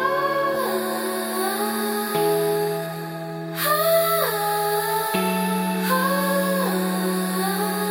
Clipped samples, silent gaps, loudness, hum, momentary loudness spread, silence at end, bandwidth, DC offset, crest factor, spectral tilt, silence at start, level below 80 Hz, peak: under 0.1%; none; -22 LUFS; none; 5 LU; 0 s; 17 kHz; under 0.1%; 16 dB; -4 dB/octave; 0 s; -66 dBFS; -6 dBFS